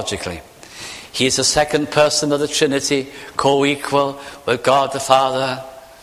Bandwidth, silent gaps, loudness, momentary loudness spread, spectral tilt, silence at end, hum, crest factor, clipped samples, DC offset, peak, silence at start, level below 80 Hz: 15.5 kHz; none; -17 LUFS; 15 LU; -3 dB/octave; 0.2 s; none; 18 dB; under 0.1%; under 0.1%; 0 dBFS; 0 s; -48 dBFS